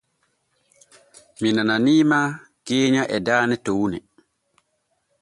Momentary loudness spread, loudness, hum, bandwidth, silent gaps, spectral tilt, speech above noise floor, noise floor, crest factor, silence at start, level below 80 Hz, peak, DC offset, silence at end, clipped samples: 10 LU; -20 LUFS; none; 11.5 kHz; none; -5 dB/octave; 52 dB; -71 dBFS; 18 dB; 1.4 s; -60 dBFS; -4 dBFS; under 0.1%; 1.2 s; under 0.1%